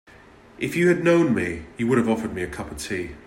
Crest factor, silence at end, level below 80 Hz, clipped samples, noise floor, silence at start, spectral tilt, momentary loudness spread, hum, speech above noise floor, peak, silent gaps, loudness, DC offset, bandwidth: 16 dB; 0.05 s; -50 dBFS; under 0.1%; -49 dBFS; 0.6 s; -6 dB/octave; 12 LU; none; 27 dB; -6 dBFS; none; -23 LUFS; under 0.1%; 16.5 kHz